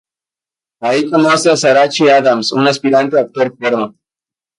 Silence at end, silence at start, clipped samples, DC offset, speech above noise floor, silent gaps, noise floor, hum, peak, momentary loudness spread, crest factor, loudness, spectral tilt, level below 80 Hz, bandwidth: 0.7 s; 0.8 s; under 0.1%; under 0.1%; 78 dB; none; -89 dBFS; none; 0 dBFS; 7 LU; 14 dB; -12 LUFS; -4 dB/octave; -62 dBFS; 11.5 kHz